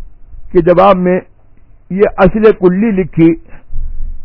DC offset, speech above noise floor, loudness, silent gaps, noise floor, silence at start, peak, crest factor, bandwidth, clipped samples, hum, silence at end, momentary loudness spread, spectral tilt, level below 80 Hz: under 0.1%; 30 dB; -10 LUFS; none; -39 dBFS; 0 s; 0 dBFS; 12 dB; 5.4 kHz; 1%; none; 0 s; 19 LU; -10.5 dB/octave; -24 dBFS